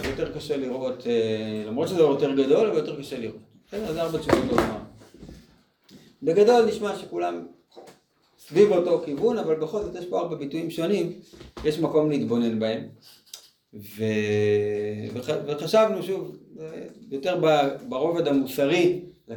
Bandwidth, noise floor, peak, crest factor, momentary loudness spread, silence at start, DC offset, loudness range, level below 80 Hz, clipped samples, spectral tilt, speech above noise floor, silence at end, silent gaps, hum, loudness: 19.5 kHz; -61 dBFS; -4 dBFS; 20 dB; 17 LU; 0 s; under 0.1%; 3 LU; -54 dBFS; under 0.1%; -6 dB/octave; 37 dB; 0 s; none; none; -24 LUFS